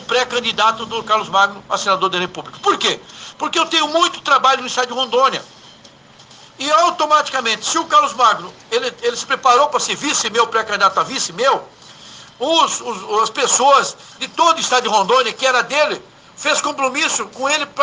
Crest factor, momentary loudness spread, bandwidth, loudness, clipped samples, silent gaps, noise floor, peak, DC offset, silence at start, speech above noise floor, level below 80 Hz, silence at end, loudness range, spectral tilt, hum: 18 dB; 9 LU; 10.5 kHz; -16 LUFS; under 0.1%; none; -44 dBFS; 0 dBFS; under 0.1%; 0 s; 28 dB; -64 dBFS; 0 s; 2 LU; -1 dB/octave; none